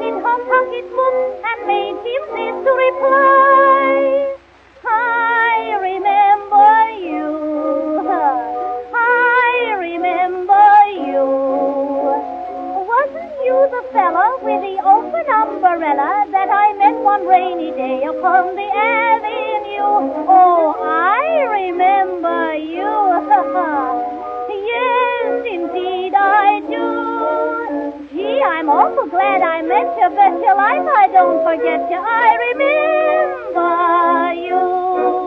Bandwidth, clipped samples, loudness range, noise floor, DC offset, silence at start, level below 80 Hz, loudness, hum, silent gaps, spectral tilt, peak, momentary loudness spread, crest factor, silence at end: 5.4 kHz; under 0.1%; 4 LU; -42 dBFS; under 0.1%; 0 s; -56 dBFS; -15 LUFS; none; none; -5.5 dB/octave; 0 dBFS; 10 LU; 14 dB; 0 s